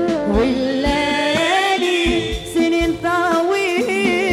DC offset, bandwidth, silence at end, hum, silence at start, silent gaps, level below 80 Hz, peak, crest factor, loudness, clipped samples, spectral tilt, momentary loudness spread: under 0.1%; 15.5 kHz; 0 s; none; 0 s; none; -34 dBFS; -4 dBFS; 12 dB; -17 LUFS; under 0.1%; -4.5 dB/octave; 3 LU